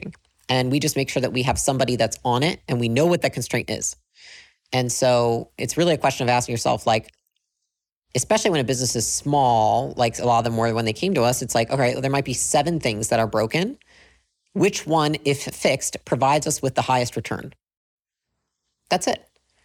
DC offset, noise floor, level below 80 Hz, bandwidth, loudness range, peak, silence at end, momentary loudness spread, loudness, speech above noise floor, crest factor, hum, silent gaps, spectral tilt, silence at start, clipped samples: under 0.1%; -82 dBFS; -50 dBFS; 17.5 kHz; 3 LU; -6 dBFS; 0.45 s; 7 LU; -22 LUFS; 60 dB; 16 dB; none; 7.92-8.02 s, 17.77-17.98 s; -4 dB/octave; 0.05 s; under 0.1%